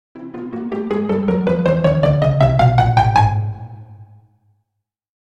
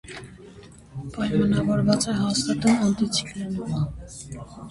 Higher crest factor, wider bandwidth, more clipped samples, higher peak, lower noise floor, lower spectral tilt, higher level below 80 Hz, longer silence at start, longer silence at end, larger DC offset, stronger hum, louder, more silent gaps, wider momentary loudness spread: about the same, 16 dB vs 18 dB; second, 8.2 kHz vs 11.5 kHz; neither; first, 0 dBFS vs -8 dBFS; first, -78 dBFS vs -46 dBFS; first, -8.5 dB/octave vs -5 dB/octave; first, -34 dBFS vs -46 dBFS; about the same, 0.15 s vs 0.05 s; first, 1.25 s vs 0 s; neither; neither; first, -16 LUFS vs -23 LUFS; neither; about the same, 16 LU vs 18 LU